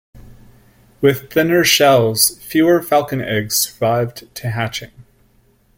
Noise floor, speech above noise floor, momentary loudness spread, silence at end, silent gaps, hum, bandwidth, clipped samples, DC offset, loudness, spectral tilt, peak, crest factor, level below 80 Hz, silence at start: -55 dBFS; 39 dB; 13 LU; 0.75 s; none; none; 17 kHz; under 0.1%; under 0.1%; -15 LUFS; -3.5 dB/octave; 0 dBFS; 18 dB; -50 dBFS; 0.15 s